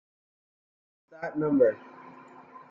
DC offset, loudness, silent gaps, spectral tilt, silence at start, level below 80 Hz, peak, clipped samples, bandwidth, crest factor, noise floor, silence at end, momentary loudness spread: under 0.1%; -26 LUFS; none; -8.5 dB/octave; 1.2 s; -72 dBFS; -10 dBFS; under 0.1%; 5.4 kHz; 20 dB; -50 dBFS; 0.15 s; 25 LU